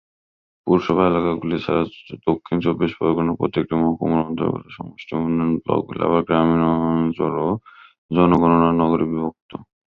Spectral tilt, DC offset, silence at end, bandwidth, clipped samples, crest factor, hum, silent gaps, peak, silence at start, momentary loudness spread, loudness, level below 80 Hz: -9.5 dB/octave; under 0.1%; 0.3 s; 5.8 kHz; under 0.1%; 18 dB; none; 7.98-8.09 s, 9.42-9.49 s; -2 dBFS; 0.65 s; 12 LU; -20 LUFS; -46 dBFS